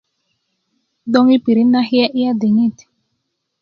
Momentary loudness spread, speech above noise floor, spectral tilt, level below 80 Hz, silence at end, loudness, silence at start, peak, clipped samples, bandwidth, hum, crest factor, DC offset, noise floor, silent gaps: 6 LU; 59 dB; -7 dB/octave; -64 dBFS; 0.9 s; -14 LUFS; 1.05 s; 0 dBFS; under 0.1%; 6.6 kHz; none; 16 dB; under 0.1%; -72 dBFS; none